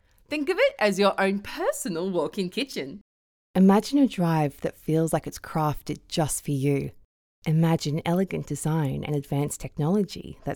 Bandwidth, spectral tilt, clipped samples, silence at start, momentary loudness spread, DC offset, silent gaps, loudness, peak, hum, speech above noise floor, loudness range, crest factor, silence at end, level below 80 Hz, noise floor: 18.5 kHz; -6 dB/octave; under 0.1%; 0.3 s; 10 LU; under 0.1%; 3.01-3.54 s, 7.05-7.42 s; -26 LUFS; -8 dBFS; none; over 65 dB; 2 LU; 18 dB; 0 s; -52 dBFS; under -90 dBFS